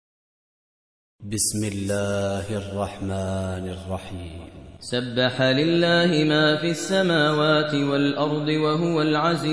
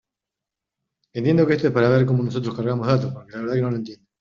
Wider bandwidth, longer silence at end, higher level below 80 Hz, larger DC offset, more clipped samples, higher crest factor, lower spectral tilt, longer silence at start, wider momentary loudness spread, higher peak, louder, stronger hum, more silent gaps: first, 11 kHz vs 7 kHz; second, 0 s vs 0.25 s; about the same, -52 dBFS vs -56 dBFS; neither; neither; about the same, 16 dB vs 18 dB; second, -4.5 dB/octave vs -7.5 dB/octave; about the same, 1.2 s vs 1.15 s; about the same, 13 LU vs 13 LU; about the same, -6 dBFS vs -4 dBFS; about the same, -22 LUFS vs -21 LUFS; neither; neither